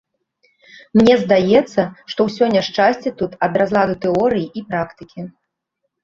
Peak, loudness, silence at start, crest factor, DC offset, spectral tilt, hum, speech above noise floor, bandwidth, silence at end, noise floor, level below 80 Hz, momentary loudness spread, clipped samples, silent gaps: -2 dBFS; -17 LUFS; 0.95 s; 16 dB; under 0.1%; -6.5 dB/octave; none; 58 dB; 7.6 kHz; 0.75 s; -75 dBFS; -52 dBFS; 13 LU; under 0.1%; none